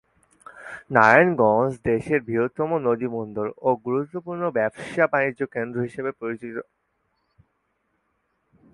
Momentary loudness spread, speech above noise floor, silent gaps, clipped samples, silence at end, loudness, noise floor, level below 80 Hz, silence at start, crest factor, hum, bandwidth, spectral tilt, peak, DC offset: 15 LU; 50 dB; none; under 0.1%; 2.1 s; -22 LUFS; -72 dBFS; -60 dBFS; 0.55 s; 24 dB; none; 11.5 kHz; -7.5 dB/octave; 0 dBFS; under 0.1%